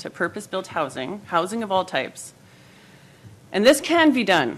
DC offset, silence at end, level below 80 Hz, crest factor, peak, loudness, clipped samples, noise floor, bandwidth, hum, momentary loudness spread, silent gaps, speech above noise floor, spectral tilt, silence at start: under 0.1%; 0 s; -62 dBFS; 18 dB; -4 dBFS; -22 LUFS; under 0.1%; -50 dBFS; 15 kHz; none; 15 LU; none; 28 dB; -4 dB/octave; 0 s